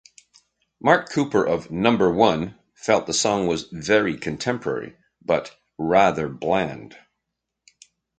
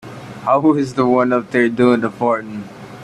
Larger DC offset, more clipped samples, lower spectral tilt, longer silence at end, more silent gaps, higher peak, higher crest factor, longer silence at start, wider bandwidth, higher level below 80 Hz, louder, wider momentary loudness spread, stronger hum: neither; neither; second, -4.5 dB/octave vs -7 dB/octave; first, 1.25 s vs 0 s; neither; about the same, -2 dBFS vs 0 dBFS; first, 22 dB vs 16 dB; first, 0.85 s vs 0.05 s; second, 9.6 kHz vs 11 kHz; about the same, -54 dBFS vs -56 dBFS; second, -22 LUFS vs -16 LUFS; second, 12 LU vs 16 LU; neither